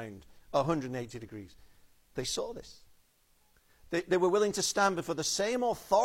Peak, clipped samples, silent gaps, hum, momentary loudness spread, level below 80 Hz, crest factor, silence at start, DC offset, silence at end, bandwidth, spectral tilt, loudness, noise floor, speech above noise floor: -12 dBFS; under 0.1%; none; none; 17 LU; -60 dBFS; 20 dB; 0 s; under 0.1%; 0 s; 16.5 kHz; -3.5 dB/octave; -31 LUFS; -68 dBFS; 37 dB